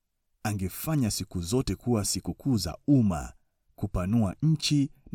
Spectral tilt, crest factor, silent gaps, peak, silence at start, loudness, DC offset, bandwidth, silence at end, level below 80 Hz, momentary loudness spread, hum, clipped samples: -5.5 dB/octave; 16 dB; none; -12 dBFS; 0.45 s; -28 LUFS; under 0.1%; 17.5 kHz; 0.05 s; -46 dBFS; 10 LU; none; under 0.1%